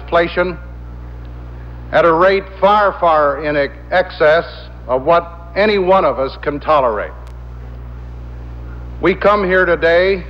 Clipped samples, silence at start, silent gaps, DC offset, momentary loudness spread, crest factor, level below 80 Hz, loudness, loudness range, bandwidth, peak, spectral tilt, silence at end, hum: under 0.1%; 0 s; none; under 0.1%; 20 LU; 14 dB; -32 dBFS; -14 LUFS; 4 LU; 6.8 kHz; -2 dBFS; -7.5 dB/octave; 0 s; 60 Hz at -35 dBFS